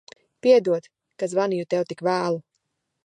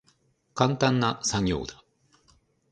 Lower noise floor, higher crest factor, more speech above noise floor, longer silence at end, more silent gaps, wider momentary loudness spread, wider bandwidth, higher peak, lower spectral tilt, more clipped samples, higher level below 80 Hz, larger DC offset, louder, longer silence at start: first, -76 dBFS vs -67 dBFS; second, 18 dB vs 24 dB; first, 55 dB vs 42 dB; second, 0.65 s vs 1 s; neither; second, 10 LU vs 14 LU; about the same, 10.5 kHz vs 9.8 kHz; about the same, -6 dBFS vs -4 dBFS; first, -6 dB/octave vs -4.5 dB/octave; neither; second, -78 dBFS vs -50 dBFS; neither; first, -23 LUFS vs -26 LUFS; about the same, 0.45 s vs 0.55 s